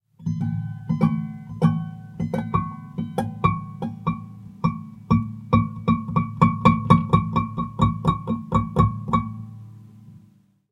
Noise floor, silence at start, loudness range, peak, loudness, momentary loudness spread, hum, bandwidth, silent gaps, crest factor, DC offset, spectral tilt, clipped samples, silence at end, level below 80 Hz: -56 dBFS; 0.2 s; 5 LU; 0 dBFS; -23 LUFS; 14 LU; none; 10.5 kHz; none; 22 dB; under 0.1%; -9 dB/octave; under 0.1%; 0.55 s; -40 dBFS